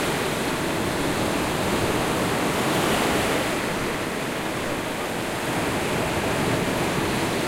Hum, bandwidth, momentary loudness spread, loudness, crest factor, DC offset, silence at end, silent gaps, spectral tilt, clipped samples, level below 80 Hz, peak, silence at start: none; 16 kHz; 5 LU; -24 LUFS; 14 dB; under 0.1%; 0 s; none; -4 dB/octave; under 0.1%; -44 dBFS; -10 dBFS; 0 s